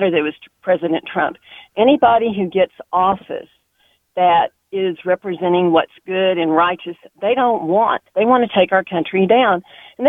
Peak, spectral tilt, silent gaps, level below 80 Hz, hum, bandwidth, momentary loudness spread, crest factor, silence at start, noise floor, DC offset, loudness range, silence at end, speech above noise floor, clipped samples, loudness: 0 dBFS; -8 dB/octave; none; -58 dBFS; none; 3.9 kHz; 10 LU; 16 dB; 0 s; -61 dBFS; under 0.1%; 3 LU; 0 s; 44 dB; under 0.1%; -17 LUFS